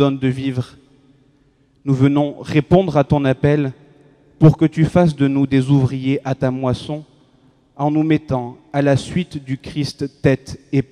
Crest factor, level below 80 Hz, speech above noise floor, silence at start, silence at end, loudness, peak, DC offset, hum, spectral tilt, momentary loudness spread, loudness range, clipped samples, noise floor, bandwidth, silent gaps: 18 dB; -44 dBFS; 40 dB; 0 s; 0.1 s; -18 LUFS; 0 dBFS; under 0.1%; none; -8 dB/octave; 10 LU; 5 LU; under 0.1%; -56 dBFS; 10.5 kHz; none